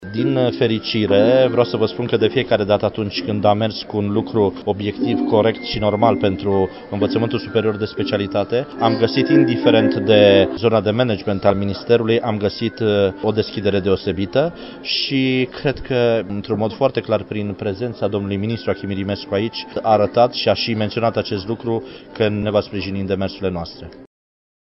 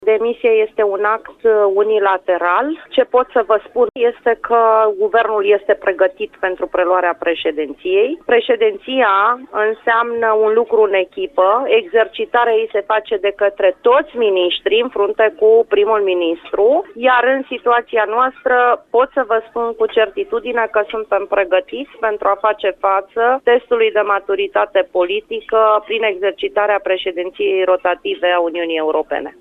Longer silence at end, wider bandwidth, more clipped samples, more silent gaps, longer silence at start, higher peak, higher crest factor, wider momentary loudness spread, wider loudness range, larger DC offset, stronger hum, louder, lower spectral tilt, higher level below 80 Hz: first, 0.75 s vs 0.1 s; first, 5.8 kHz vs 4 kHz; neither; neither; about the same, 0 s vs 0 s; about the same, 0 dBFS vs -2 dBFS; about the same, 18 dB vs 14 dB; first, 9 LU vs 5 LU; first, 6 LU vs 2 LU; neither; neither; second, -18 LUFS vs -15 LUFS; first, -10 dB/octave vs -5.5 dB/octave; first, -48 dBFS vs -56 dBFS